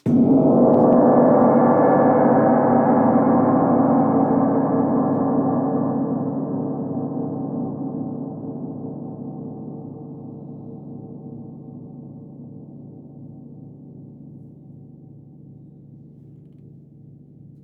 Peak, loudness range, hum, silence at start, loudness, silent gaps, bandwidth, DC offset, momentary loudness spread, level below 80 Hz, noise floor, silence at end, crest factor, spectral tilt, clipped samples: -4 dBFS; 24 LU; none; 0.05 s; -18 LUFS; none; 2.6 kHz; under 0.1%; 25 LU; -58 dBFS; -45 dBFS; 1.7 s; 16 dB; -12.5 dB/octave; under 0.1%